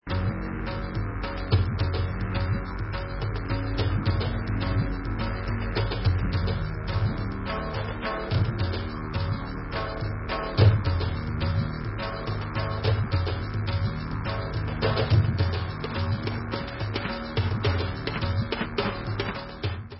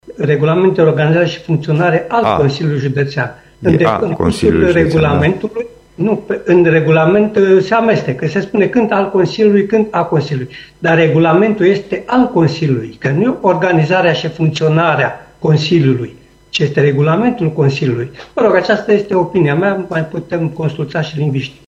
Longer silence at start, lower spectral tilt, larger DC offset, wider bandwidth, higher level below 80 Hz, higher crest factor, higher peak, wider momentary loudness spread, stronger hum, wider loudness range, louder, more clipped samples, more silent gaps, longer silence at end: about the same, 0.05 s vs 0.05 s; first, -11 dB/octave vs -7.5 dB/octave; neither; second, 5.8 kHz vs 10.5 kHz; first, -34 dBFS vs -42 dBFS; first, 20 dB vs 12 dB; second, -6 dBFS vs 0 dBFS; second, 6 LU vs 9 LU; neither; about the same, 2 LU vs 2 LU; second, -28 LUFS vs -13 LUFS; neither; neither; second, 0 s vs 0.15 s